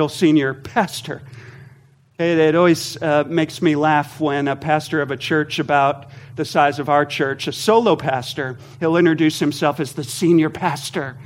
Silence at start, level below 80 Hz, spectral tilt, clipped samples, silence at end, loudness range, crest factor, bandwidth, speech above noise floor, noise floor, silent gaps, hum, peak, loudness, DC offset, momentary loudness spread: 0 s; -60 dBFS; -5.5 dB/octave; under 0.1%; 0 s; 1 LU; 18 dB; 16.5 kHz; 32 dB; -50 dBFS; none; none; -2 dBFS; -18 LUFS; under 0.1%; 10 LU